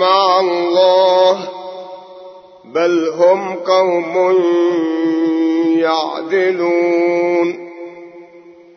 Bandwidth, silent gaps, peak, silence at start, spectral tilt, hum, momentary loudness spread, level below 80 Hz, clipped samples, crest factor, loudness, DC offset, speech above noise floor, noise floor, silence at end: 6.4 kHz; none; 0 dBFS; 0 s; -5 dB/octave; none; 18 LU; -72 dBFS; under 0.1%; 14 dB; -14 LUFS; under 0.1%; 27 dB; -41 dBFS; 0.25 s